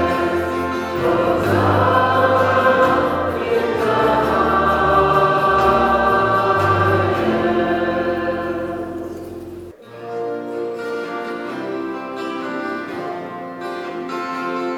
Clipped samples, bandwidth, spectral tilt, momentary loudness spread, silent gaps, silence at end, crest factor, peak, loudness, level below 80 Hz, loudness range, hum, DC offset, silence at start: under 0.1%; 17 kHz; -6.5 dB/octave; 13 LU; none; 0 s; 16 dB; -2 dBFS; -18 LUFS; -44 dBFS; 11 LU; none; under 0.1%; 0 s